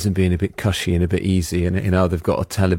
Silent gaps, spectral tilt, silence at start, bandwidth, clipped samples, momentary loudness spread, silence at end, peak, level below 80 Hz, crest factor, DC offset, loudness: none; -6.5 dB/octave; 0 s; 16.5 kHz; under 0.1%; 3 LU; 0 s; -4 dBFS; -40 dBFS; 16 dB; under 0.1%; -20 LUFS